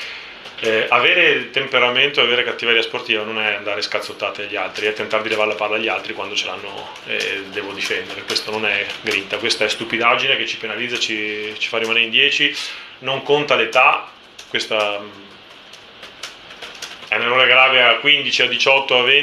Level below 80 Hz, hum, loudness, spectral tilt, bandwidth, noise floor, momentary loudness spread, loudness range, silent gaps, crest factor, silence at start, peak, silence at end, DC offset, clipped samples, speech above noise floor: -64 dBFS; none; -16 LUFS; -2 dB/octave; 13 kHz; -41 dBFS; 16 LU; 6 LU; none; 18 dB; 0 s; 0 dBFS; 0 s; under 0.1%; under 0.1%; 23 dB